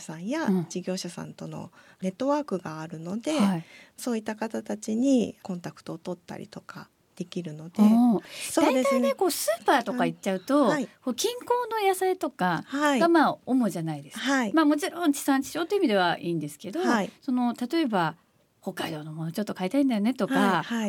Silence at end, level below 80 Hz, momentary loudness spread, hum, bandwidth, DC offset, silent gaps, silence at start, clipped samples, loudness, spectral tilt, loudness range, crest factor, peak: 0 s; -74 dBFS; 14 LU; none; 18 kHz; under 0.1%; none; 0 s; under 0.1%; -26 LUFS; -5 dB/octave; 6 LU; 16 dB; -10 dBFS